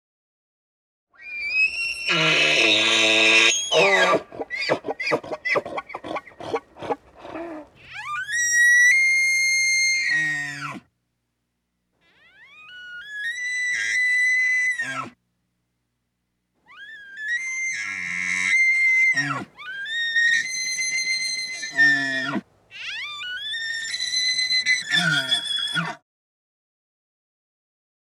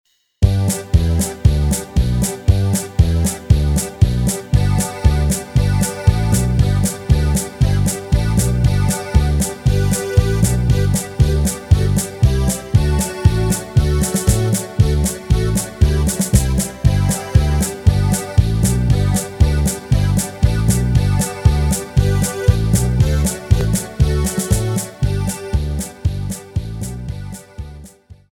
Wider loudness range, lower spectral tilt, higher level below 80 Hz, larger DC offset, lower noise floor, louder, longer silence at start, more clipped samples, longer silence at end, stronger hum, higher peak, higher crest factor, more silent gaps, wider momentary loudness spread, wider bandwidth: first, 11 LU vs 2 LU; second, -1 dB/octave vs -5.5 dB/octave; second, -68 dBFS vs -20 dBFS; neither; first, -76 dBFS vs -41 dBFS; about the same, -19 LUFS vs -17 LUFS; first, 1.2 s vs 0.4 s; neither; first, 2.05 s vs 0.2 s; first, 60 Hz at -75 dBFS vs none; second, -6 dBFS vs 0 dBFS; about the same, 18 dB vs 16 dB; neither; first, 18 LU vs 5 LU; second, 15 kHz vs 19.5 kHz